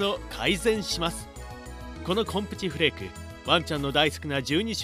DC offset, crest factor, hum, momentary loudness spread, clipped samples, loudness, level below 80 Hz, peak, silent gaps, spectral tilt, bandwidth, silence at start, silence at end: under 0.1%; 22 dB; none; 16 LU; under 0.1%; -26 LUFS; -44 dBFS; -6 dBFS; none; -4 dB/octave; 15.5 kHz; 0 s; 0 s